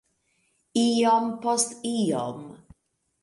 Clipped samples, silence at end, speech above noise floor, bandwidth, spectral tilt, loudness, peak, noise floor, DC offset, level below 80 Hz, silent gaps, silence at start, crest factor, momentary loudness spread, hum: under 0.1%; 0.65 s; 48 dB; 11.5 kHz; -4 dB/octave; -25 LUFS; -10 dBFS; -72 dBFS; under 0.1%; -68 dBFS; none; 0.75 s; 18 dB; 13 LU; none